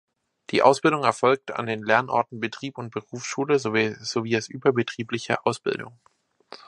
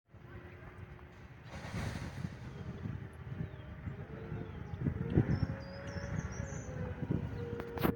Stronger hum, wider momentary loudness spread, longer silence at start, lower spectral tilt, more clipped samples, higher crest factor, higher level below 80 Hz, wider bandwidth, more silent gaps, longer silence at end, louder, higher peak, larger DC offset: neither; second, 13 LU vs 17 LU; first, 0.5 s vs 0.1 s; second, -4.5 dB/octave vs -7 dB/octave; neither; about the same, 22 dB vs 26 dB; second, -68 dBFS vs -52 dBFS; second, 11.5 kHz vs 17 kHz; neither; first, 0.8 s vs 0 s; first, -24 LUFS vs -40 LUFS; first, -2 dBFS vs -14 dBFS; neither